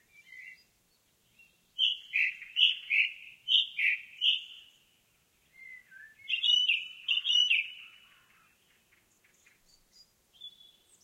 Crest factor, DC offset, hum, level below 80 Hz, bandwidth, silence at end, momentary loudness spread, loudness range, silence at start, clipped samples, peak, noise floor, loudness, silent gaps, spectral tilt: 24 dB; under 0.1%; none; -82 dBFS; 16 kHz; 0.55 s; 25 LU; 4 LU; 0.3 s; under 0.1%; -10 dBFS; -71 dBFS; -27 LUFS; none; 4 dB/octave